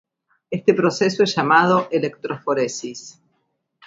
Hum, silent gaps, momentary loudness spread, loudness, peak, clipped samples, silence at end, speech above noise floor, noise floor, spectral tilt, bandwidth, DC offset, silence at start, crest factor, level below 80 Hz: none; none; 15 LU; -19 LUFS; 0 dBFS; under 0.1%; 0.75 s; 52 dB; -71 dBFS; -5 dB/octave; 7.8 kHz; under 0.1%; 0.5 s; 20 dB; -64 dBFS